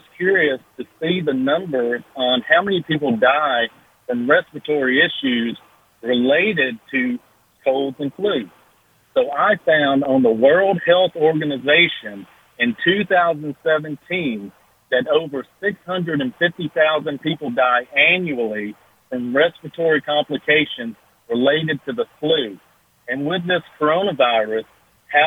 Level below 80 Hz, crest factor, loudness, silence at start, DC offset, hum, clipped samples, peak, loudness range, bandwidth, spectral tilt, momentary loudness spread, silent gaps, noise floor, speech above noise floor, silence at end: -62 dBFS; 18 dB; -18 LUFS; 0.2 s; under 0.1%; none; under 0.1%; -2 dBFS; 5 LU; 15.5 kHz; -7 dB/octave; 12 LU; none; -57 dBFS; 39 dB; 0 s